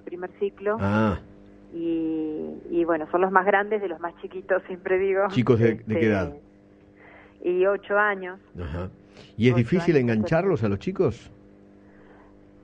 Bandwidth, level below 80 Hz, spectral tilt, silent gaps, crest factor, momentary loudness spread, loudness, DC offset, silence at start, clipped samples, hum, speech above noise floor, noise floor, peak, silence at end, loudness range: 8 kHz; -52 dBFS; -8.5 dB/octave; none; 24 dB; 14 LU; -24 LUFS; under 0.1%; 0.05 s; under 0.1%; none; 29 dB; -53 dBFS; -2 dBFS; 1.35 s; 3 LU